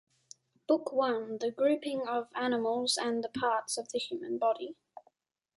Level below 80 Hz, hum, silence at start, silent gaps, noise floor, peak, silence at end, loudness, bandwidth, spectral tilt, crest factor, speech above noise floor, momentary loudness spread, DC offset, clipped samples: -78 dBFS; none; 0.7 s; none; -72 dBFS; -16 dBFS; 0.55 s; -32 LUFS; 11.5 kHz; -2.5 dB/octave; 18 dB; 40 dB; 7 LU; under 0.1%; under 0.1%